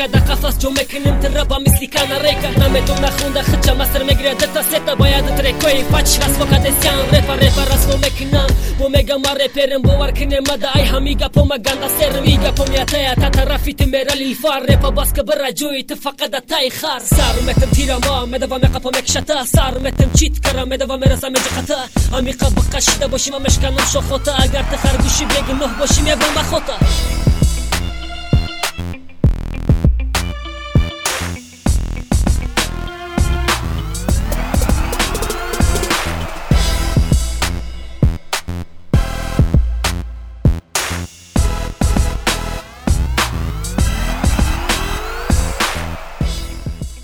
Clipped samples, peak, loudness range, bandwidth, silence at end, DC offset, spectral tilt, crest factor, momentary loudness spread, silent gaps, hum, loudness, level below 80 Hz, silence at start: under 0.1%; 0 dBFS; 5 LU; 18.5 kHz; 0 s; under 0.1%; -4.5 dB/octave; 14 dB; 8 LU; none; none; -16 LUFS; -18 dBFS; 0 s